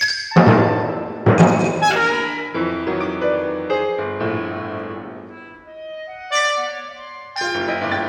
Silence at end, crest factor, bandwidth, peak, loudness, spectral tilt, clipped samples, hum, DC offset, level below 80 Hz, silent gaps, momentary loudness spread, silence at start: 0 s; 18 dB; 10.5 kHz; 0 dBFS; -19 LUFS; -5.5 dB/octave; under 0.1%; none; under 0.1%; -52 dBFS; none; 20 LU; 0 s